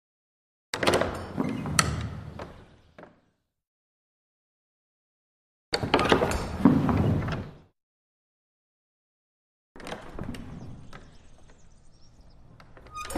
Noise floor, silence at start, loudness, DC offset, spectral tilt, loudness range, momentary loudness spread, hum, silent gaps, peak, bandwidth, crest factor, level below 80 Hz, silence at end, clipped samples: -71 dBFS; 0.75 s; -27 LUFS; under 0.1%; -5 dB/octave; 18 LU; 21 LU; none; 3.67-5.72 s, 7.83-9.75 s; -2 dBFS; 15.5 kHz; 30 dB; -46 dBFS; 0 s; under 0.1%